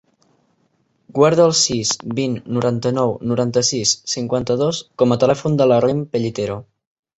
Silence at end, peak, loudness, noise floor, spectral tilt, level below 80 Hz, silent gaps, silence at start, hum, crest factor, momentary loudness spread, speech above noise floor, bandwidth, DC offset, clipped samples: 0.55 s; -2 dBFS; -18 LUFS; -64 dBFS; -4.5 dB/octave; -54 dBFS; none; 1.15 s; none; 16 dB; 9 LU; 46 dB; 8.2 kHz; under 0.1%; under 0.1%